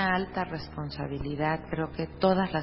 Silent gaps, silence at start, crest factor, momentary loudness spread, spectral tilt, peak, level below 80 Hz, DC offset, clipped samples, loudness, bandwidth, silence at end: none; 0 s; 18 dB; 10 LU; -10.5 dB/octave; -12 dBFS; -48 dBFS; under 0.1%; under 0.1%; -30 LUFS; 5.8 kHz; 0 s